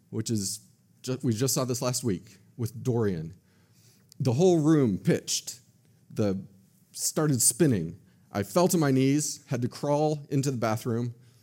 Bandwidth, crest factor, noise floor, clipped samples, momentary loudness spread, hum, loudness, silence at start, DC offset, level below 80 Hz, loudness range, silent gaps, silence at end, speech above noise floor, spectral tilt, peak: 16.5 kHz; 16 dB; -60 dBFS; under 0.1%; 14 LU; none; -27 LUFS; 0.1 s; under 0.1%; -66 dBFS; 5 LU; none; 0.3 s; 34 dB; -5 dB/octave; -10 dBFS